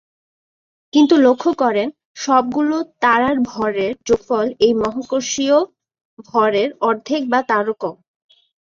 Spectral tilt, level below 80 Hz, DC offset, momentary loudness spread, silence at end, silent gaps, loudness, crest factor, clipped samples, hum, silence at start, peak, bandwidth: -4 dB/octave; -56 dBFS; under 0.1%; 8 LU; 0.7 s; 2.05-2.15 s, 6.05-6.17 s; -17 LUFS; 16 dB; under 0.1%; none; 0.95 s; -2 dBFS; 7.6 kHz